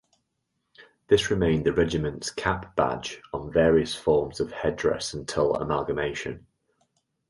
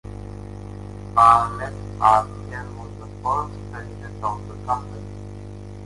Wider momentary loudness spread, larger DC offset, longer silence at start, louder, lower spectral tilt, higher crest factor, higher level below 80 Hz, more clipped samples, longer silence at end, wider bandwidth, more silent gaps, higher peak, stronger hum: second, 11 LU vs 21 LU; neither; first, 0.8 s vs 0.05 s; second, -26 LUFS vs -21 LUFS; about the same, -5 dB/octave vs -6 dB/octave; about the same, 20 dB vs 22 dB; about the same, -46 dBFS vs -42 dBFS; neither; first, 0.9 s vs 0 s; about the same, 11.5 kHz vs 11.5 kHz; neither; second, -6 dBFS vs -2 dBFS; second, none vs 50 Hz at -35 dBFS